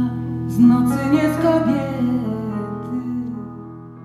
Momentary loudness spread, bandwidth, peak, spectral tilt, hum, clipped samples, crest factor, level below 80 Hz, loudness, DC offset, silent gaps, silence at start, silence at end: 16 LU; 13.5 kHz; -4 dBFS; -8 dB/octave; none; under 0.1%; 16 dB; -46 dBFS; -19 LUFS; under 0.1%; none; 0 s; 0 s